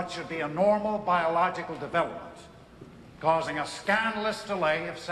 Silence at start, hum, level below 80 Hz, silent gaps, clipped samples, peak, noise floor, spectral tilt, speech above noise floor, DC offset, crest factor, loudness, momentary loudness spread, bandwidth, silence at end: 0 s; none; -60 dBFS; none; under 0.1%; -10 dBFS; -49 dBFS; -5 dB/octave; 21 dB; under 0.1%; 18 dB; -28 LUFS; 9 LU; 12.5 kHz; 0 s